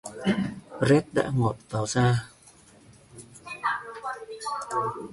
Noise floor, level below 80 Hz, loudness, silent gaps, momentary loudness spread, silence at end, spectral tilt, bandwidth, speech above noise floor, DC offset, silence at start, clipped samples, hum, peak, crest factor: -54 dBFS; -56 dBFS; -27 LUFS; none; 17 LU; 0 s; -6 dB/octave; 11.5 kHz; 30 dB; under 0.1%; 0.05 s; under 0.1%; none; -8 dBFS; 20 dB